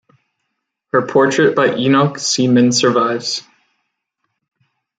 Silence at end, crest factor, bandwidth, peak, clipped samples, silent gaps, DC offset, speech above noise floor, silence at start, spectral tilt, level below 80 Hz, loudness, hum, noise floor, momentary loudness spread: 1.6 s; 14 dB; 9.4 kHz; -2 dBFS; under 0.1%; none; under 0.1%; 60 dB; 0.95 s; -4.5 dB/octave; -62 dBFS; -14 LUFS; none; -74 dBFS; 7 LU